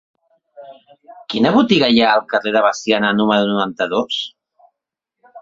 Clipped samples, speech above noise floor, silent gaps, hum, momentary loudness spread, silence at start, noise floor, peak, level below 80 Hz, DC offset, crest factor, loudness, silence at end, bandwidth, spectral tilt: under 0.1%; 65 dB; none; none; 10 LU; 0.6 s; -81 dBFS; 0 dBFS; -58 dBFS; under 0.1%; 18 dB; -16 LUFS; 0 s; 7.6 kHz; -5 dB/octave